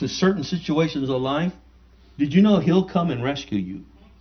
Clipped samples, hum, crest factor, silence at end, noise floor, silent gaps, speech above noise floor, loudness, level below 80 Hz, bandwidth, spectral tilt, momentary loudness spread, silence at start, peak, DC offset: under 0.1%; none; 18 dB; 0.35 s; -51 dBFS; none; 30 dB; -22 LUFS; -50 dBFS; 6.6 kHz; -7 dB/octave; 11 LU; 0 s; -4 dBFS; under 0.1%